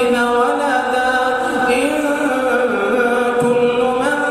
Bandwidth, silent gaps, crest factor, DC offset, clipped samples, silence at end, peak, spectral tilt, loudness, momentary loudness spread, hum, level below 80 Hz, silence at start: 14 kHz; none; 12 dB; under 0.1%; under 0.1%; 0 s; -2 dBFS; -4 dB/octave; -16 LUFS; 2 LU; none; -50 dBFS; 0 s